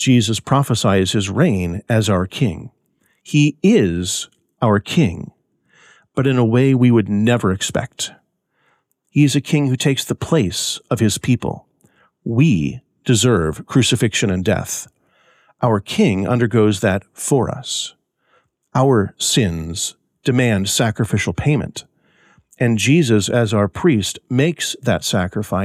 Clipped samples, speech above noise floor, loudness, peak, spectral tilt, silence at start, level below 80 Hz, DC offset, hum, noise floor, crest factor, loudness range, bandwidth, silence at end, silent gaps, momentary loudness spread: under 0.1%; 48 dB; -17 LUFS; -4 dBFS; -5 dB/octave; 0 s; -46 dBFS; under 0.1%; none; -65 dBFS; 14 dB; 2 LU; 15 kHz; 0 s; none; 9 LU